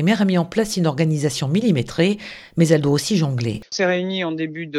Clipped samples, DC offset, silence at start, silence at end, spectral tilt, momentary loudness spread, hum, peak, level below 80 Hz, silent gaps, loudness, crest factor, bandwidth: under 0.1%; under 0.1%; 0 s; 0 s; -6 dB/octave; 7 LU; none; -2 dBFS; -52 dBFS; none; -20 LUFS; 18 dB; 13 kHz